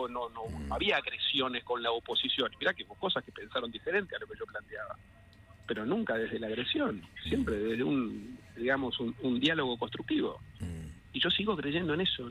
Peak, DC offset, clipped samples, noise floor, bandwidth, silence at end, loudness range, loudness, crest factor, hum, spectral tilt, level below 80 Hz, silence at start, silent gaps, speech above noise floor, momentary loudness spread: -14 dBFS; under 0.1%; under 0.1%; -56 dBFS; 12.5 kHz; 0 s; 5 LU; -33 LUFS; 20 dB; none; -5.5 dB/octave; -56 dBFS; 0 s; none; 23 dB; 13 LU